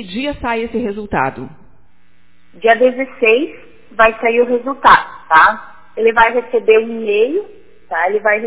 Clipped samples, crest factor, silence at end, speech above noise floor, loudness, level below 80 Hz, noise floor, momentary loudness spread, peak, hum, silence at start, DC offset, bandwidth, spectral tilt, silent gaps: under 0.1%; 14 dB; 0 s; 42 dB; -14 LUFS; -44 dBFS; -56 dBFS; 13 LU; 0 dBFS; none; 0 s; 1%; 4 kHz; -8 dB/octave; none